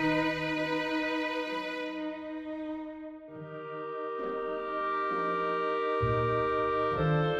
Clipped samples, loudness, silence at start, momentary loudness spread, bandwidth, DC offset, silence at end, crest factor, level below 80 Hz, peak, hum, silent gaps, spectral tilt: under 0.1%; -32 LUFS; 0 s; 12 LU; 12.5 kHz; under 0.1%; 0 s; 14 dB; -54 dBFS; -16 dBFS; none; none; -7 dB/octave